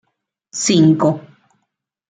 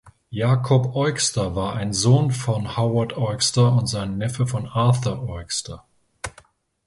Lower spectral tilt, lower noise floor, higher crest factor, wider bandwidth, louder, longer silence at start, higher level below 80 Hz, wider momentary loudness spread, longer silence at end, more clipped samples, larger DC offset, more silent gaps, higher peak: about the same, -5 dB/octave vs -5 dB/octave; first, -73 dBFS vs -54 dBFS; about the same, 16 dB vs 18 dB; second, 9.4 kHz vs 11.5 kHz; first, -15 LUFS vs -21 LUFS; first, 0.55 s vs 0.05 s; second, -58 dBFS vs -46 dBFS; about the same, 16 LU vs 16 LU; first, 0.9 s vs 0.55 s; neither; neither; neither; about the same, -2 dBFS vs -4 dBFS